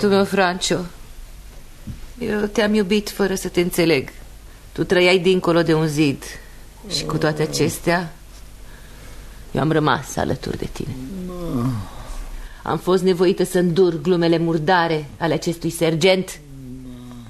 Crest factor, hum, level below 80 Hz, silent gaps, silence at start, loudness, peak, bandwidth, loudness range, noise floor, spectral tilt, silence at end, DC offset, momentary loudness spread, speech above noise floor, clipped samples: 18 dB; none; -40 dBFS; none; 0 s; -19 LUFS; -2 dBFS; 13.5 kHz; 6 LU; -40 dBFS; -5 dB/octave; 0 s; under 0.1%; 20 LU; 21 dB; under 0.1%